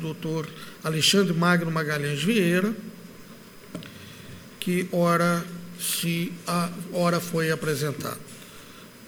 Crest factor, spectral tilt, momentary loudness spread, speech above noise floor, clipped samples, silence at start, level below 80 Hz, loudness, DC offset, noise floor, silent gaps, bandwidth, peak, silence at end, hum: 20 dB; -4.5 dB/octave; 22 LU; 21 dB; under 0.1%; 0 s; -62 dBFS; -25 LUFS; under 0.1%; -46 dBFS; none; over 20 kHz; -6 dBFS; 0 s; none